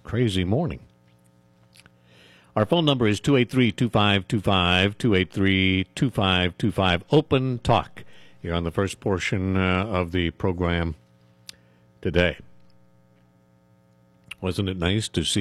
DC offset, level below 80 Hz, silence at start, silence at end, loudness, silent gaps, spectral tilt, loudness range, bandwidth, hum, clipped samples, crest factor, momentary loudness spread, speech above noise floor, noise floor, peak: under 0.1%; -44 dBFS; 0.05 s; 0 s; -23 LUFS; none; -5.5 dB/octave; 9 LU; 13.5 kHz; none; under 0.1%; 18 dB; 10 LU; 36 dB; -59 dBFS; -6 dBFS